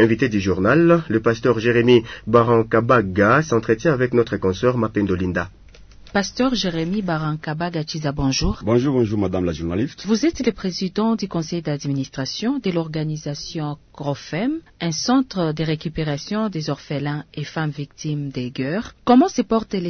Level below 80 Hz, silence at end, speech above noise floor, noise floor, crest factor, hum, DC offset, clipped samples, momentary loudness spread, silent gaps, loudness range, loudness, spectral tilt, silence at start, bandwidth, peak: -42 dBFS; 0 s; 23 dB; -43 dBFS; 18 dB; none; under 0.1%; under 0.1%; 11 LU; none; 8 LU; -20 LUFS; -6 dB/octave; 0 s; 6.6 kHz; -2 dBFS